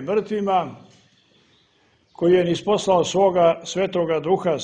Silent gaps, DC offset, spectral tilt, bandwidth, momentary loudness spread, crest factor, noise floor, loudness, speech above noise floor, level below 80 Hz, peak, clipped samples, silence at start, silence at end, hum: none; under 0.1%; -5.5 dB/octave; 9.6 kHz; 6 LU; 16 dB; -61 dBFS; -20 LUFS; 41 dB; -58 dBFS; -4 dBFS; under 0.1%; 0 s; 0 s; none